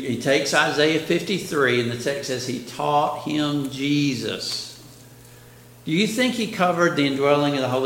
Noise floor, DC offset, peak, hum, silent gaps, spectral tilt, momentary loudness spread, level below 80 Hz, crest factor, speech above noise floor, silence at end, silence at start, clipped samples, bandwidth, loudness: -46 dBFS; under 0.1%; -2 dBFS; none; none; -4.5 dB/octave; 8 LU; -62 dBFS; 20 dB; 25 dB; 0 s; 0 s; under 0.1%; 17 kHz; -22 LUFS